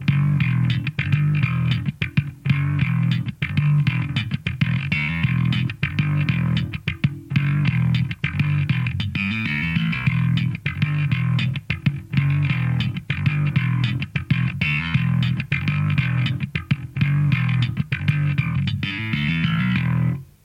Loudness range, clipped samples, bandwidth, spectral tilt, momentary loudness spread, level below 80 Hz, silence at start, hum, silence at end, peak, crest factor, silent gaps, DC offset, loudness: 1 LU; under 0.1%; 7 kHz; -7.5 dB/octave; 4 LU; -44 dBFS; 0 s; none; 0.2 s; -6 dBFS; 14 dB; none; under 0.1%; -22 LUFS